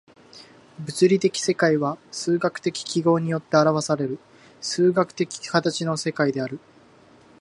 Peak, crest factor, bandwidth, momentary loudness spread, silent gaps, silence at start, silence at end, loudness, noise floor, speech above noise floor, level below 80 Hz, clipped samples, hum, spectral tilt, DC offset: -2 dBFS; 22 dB; 11.5 kHz; 11 LU; none; 0.35 s; 0.85 s; -23 LUFS; -52 dBFS; 30 dB; -70 dBFS; under 0.1%; none; -5 dB/octave; under 0.1%